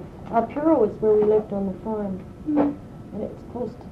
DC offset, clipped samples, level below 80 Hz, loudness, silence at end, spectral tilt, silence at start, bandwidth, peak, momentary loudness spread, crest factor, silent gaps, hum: under 0.1%; under 0.1%; -48 dBFS; -24 LUFS; 0 s; -10 dB/octave; 0 s; 5.2 kHz; -6 dBFS; 14 LU; 16 dB; none; none